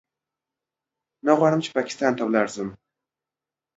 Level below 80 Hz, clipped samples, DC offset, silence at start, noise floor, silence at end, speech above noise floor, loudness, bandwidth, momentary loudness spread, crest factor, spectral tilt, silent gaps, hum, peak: -68 dBFS; under 0.1%; under 0.1%; 1.25 s; -89 dBFS; 1.05 s; 68 dB; -22 LUFS; 8 kHz; 11 LU; 22 dB; -5.5 dB/octave; none; none; -4 dBFS